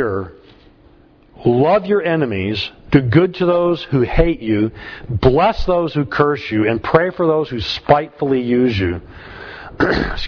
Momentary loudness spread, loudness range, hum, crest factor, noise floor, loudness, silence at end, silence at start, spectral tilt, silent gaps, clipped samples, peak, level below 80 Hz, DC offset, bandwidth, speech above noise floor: 12 LU; 2 LU; none; 16 dB; -48 dBFS; -17 LUFS; 0 s; 0 s; -8 dB/octave; none; under 0.1%; 0 dBFS; -32 dBFS; under 0.1%; 5.4 kHz; 32 dB